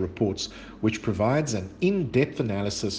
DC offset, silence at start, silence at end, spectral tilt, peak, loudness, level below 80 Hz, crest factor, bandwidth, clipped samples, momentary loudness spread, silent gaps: under 0.1%; 0 s; 0 s; -5.5 dB/octave; -10 dBFS; -26 LUFS; -52 dBFS; 16 dB; 10 kHz; under 0.1%; 5 LU; none